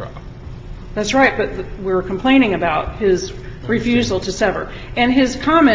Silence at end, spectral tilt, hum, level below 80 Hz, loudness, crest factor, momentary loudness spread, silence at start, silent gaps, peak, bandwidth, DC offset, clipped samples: 0 s; -5 dB/octave; none; -34 dBFS; -17 LUFS; 16 dB; 18 LU; 0 s; none; 0 dBFS; 7.8 kHz; under 0.1%; under 0.1%